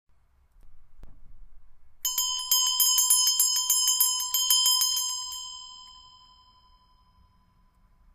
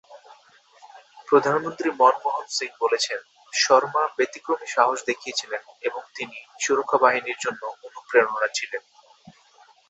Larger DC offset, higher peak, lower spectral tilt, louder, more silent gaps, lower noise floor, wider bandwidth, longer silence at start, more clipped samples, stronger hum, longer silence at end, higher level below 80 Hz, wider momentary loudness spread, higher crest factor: neither; second, -8 dBFS vs -2 dBFS; second, 4.5 dB/octave vs -2 dB/octave; about the same, -22 LUFS vs -23 LUFS; neither; first, -63 dBFS vs -56 dBFS; first, 16 kHz vs 8.4 kHz; first, 0.65 s vs 0.1 s; neither; neither; first, 2.15 s vs 1.1 s; first, -56 dBFS vs -76 dBFS; about the same, 16 LU vs 15 LU; about the same, 20 dB vs 22 dB